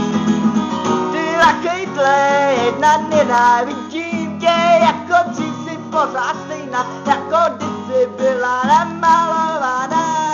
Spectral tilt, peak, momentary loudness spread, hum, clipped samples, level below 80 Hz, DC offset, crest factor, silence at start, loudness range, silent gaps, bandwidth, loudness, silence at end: -4.5 dB/octave; -4 dBFS; 9 LU; none; under 0.1%; -58 dBFS; under 0.1%; 12 dB; 0 s; 4 LU; none; 7.8 kHz; -16 LUFS; 0 s